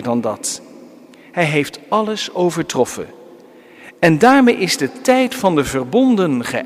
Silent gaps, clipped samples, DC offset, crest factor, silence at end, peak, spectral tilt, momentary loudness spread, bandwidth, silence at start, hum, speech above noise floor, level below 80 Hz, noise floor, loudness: none; under 0.1%; under 0.1%; 16 dB; 0 s; 0 dBFS; -4.5 dB/octave; 11 LU; 16 kHz; 0 s; none; 27 dB; -52 dBFS; -42 dBFS; -16 LUFS